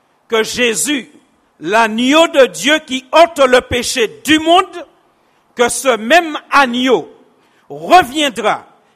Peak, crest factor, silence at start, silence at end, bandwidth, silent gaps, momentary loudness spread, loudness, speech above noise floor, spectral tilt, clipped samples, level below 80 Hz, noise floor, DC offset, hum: 0 dBFS; 14 dB; 0.3 s; 0.35 s; 16 kHz; none; 8 LU; -12 LUFS; 42 dB; -2.5 dB/octave; 0.1%; -46 dBFS; -55 dBFS; under 0.1%; none